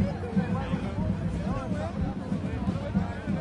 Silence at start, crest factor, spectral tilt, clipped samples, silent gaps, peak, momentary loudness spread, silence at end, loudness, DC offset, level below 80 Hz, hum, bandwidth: 0 s; 14 dB; -8.5 dB/octave; under 0.1%; none; -14 dBFS; 3 LU; 0 s; -30 LUFS; under 0.1%; -40 dBFS; none; 10.5 kHz